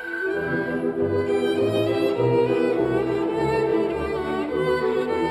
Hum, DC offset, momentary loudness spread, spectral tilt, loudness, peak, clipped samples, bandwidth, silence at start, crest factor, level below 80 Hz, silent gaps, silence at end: none; under 0.1%; 5 LU; -7 dB/octave; -23 LUFS; -10 dBFS; under 0.1%; 13.5 kHz; 0 s; 12 dB; -48 dBFS; none; 0 s